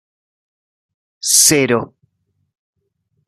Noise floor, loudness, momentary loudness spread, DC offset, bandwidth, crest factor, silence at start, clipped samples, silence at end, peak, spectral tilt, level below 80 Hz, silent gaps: -68 dBFS; -12 LUFS; 15 LU; under 0.1%; 15.5 kHz; 20 dB; 1.25 s; under 0.1%; 1.4 s; 0 dBFS; -2 dB/octave; -60 dBFS; none